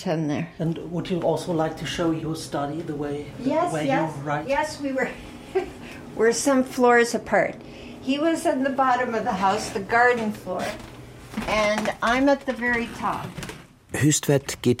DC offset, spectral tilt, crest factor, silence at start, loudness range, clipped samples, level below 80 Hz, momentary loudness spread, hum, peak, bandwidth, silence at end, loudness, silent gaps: under 0.1%; -4.5 dB/octave; 18 dB; 0 s; 4 LU; under 0.1%; -50 dBFS; 14 LU; none; -6 dBFS; 16 kHz; 0 s; -24 LUFS; none